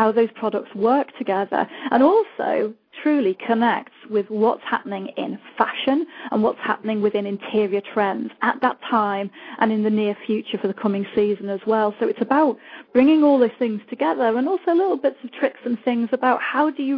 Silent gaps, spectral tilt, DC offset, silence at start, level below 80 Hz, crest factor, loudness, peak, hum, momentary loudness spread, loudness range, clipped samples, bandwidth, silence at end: none; -9 dB/octave; under 0.1%; 0 s; -70 dBFS; 18 dB; -21 LUFS; -2 dBFS; none; 8 LU; 3 LU; under 0.1%; 5.2 kHz; 0 s